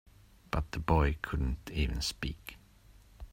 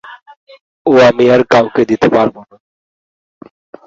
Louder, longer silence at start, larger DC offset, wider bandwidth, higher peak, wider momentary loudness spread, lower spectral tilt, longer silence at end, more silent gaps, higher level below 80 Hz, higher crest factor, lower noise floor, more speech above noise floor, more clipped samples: second, -34 LUFS vs -10 LUFS; first, 0.55 s vs 0.05 s; neither; first, 16 kHz vs 7.8 kHz; second, -12 dBFS vs 0 dBFS; first, 16 LU vs 7 LU; about the same, -5.5 dB/octave vs -6 dB/octave; second, 0.05 s vs 1.45 s; second, none vs 0.37-0.47 s, 0.61-0.85 s; first, -40 dBFS vs -50 dBFS; first, 22 dB vs 14 dB; second, -59 dBFS vs under -90 dBFS; second, 27 dB vs over 81 dB; neither